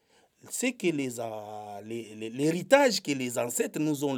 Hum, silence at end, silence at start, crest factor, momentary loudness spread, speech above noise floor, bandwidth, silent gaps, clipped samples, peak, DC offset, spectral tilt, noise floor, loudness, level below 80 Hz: none; 0 s; 0.45 s; 22 dB; 17 LU; 28 dB; over 20 kHz; none; under 0.1%; -6 dBFS; under 0.1%; -4 dB/octave; -57 dBFS; -28 LUFS; -84 dBFS